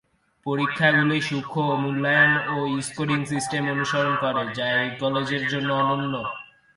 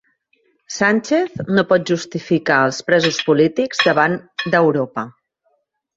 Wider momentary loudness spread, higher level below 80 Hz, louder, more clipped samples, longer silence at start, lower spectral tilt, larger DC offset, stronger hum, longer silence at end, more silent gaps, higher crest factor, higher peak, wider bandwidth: about the same, 9 LU vs 8 LU; about the same, -62 dBFS vs -60 dBFS; second, -23 LUFS vs -17 LUFS; neither; second, 0.45 s vs 0.7 s; about the same, -5 dB/octave vs -5 dB/octave; neither; neither; second, 0.35 s vs 0.85 s; neither; about the same, 18 dB vs 18 dB; second, -6 dBFS vs -2 dBFS; first, 11.5 kHz vs 8 kHz